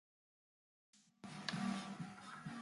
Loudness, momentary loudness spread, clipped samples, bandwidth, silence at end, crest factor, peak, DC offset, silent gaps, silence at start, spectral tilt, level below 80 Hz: -46 LUFS; 11 LU; under 0.1%; 11.5 kHz; 0 s; 26 dB; -22 dBFS; under 0.1%; none; 0.95 s; -4.5 dB/octave; -82 dBFS